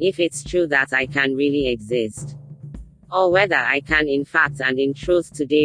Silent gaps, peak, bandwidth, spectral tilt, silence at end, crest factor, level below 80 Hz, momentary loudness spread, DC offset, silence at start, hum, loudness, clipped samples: none; -2 dBFS; 10.5 kHz; -4.5 dB/octave; 0 s; 18 dB; -44 dBFS; 17 LU; under 0.1%; 0 s; none; -19 LUFS; under 0.1%